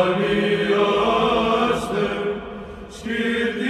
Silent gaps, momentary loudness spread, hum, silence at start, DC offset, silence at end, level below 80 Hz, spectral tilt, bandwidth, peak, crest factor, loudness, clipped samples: none; 15 LU; none; 0 s; under 0.1%; 0 s; -46 dBFS; -5.5 dB/octave; 13 kHz; -6 dBFS; 16 dB; -20 LUFS; under 0.1%